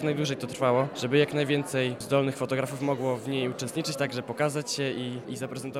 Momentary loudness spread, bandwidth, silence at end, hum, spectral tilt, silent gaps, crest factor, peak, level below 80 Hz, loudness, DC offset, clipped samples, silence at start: 6 LU; 16 kHz; 0 s; none; -5 dB/octave; none; 18 dB; -10 dBFS; -72 dBFS; -28 LUFS; under 0.1%; under 0.1%; 0 s